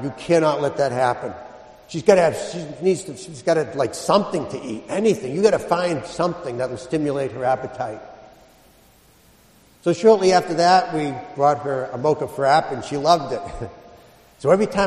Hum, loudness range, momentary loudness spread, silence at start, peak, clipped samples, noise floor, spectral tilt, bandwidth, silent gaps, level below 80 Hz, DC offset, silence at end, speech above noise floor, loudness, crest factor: none; 7 LU; 14 LU; 0 s; 0 dBFS; under 0.1%; -53 dBFS; -5 dB/octave; 13 kHz; none; -52 dBFS; under 0.1%; 0 s; 33 dB; -20 LUFS; 20 dB